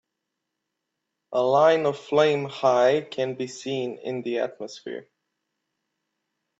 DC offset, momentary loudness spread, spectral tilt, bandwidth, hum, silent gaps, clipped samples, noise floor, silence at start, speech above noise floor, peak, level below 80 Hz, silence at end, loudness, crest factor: under 0.1%; 16 LU; -5 dB/octave; 8 kHz; none; none; under 0.1%; -82 dBFS; 1.3 s; 59 dB; -6 dBFS; -74 dBFS; 1.55 s; -24 LUFS; 20 dB